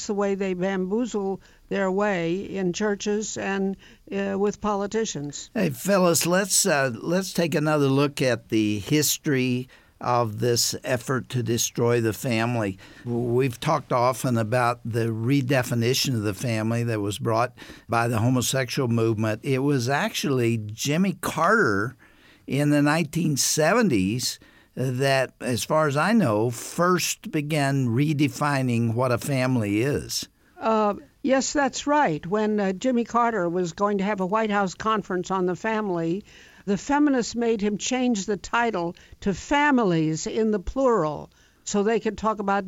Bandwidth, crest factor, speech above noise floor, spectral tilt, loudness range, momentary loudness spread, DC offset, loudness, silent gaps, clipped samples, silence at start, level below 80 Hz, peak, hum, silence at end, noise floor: 17 kHz; 16 dB; 25 dB; -5 dB/octave; 3 LU; 8 LU; under 0.1%; -24 LUFS; none; under 0.1%; 0 s; -52 dBFS; -8 dBFS; none; 0 s; -49 dBFS